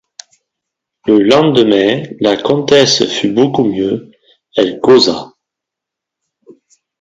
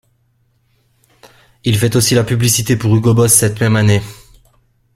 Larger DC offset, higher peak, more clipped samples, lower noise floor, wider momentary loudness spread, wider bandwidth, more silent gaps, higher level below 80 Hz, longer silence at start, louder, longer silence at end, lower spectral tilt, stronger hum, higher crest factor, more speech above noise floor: neither; about the same, 0 dBFS vs 0 dBFS; neither; first, -81 dBFS vs -59 dBFS; about the same, 10 LU vs 8 LU; second, 7.8 kHz vs 16 kHz; neither; second, -52 dBFS vs -42 dBFS; second, 1.05 s vs 1.65 s; about the same, -11 LUFS vs -12 LUFS; first, 1.75 s vs 0.85 s; about the same, -4.5 dB/octave vs -4.5 dB/octave; neither; about the same, 14 dB vs 14 dB; first, 71 dB vs 47 dB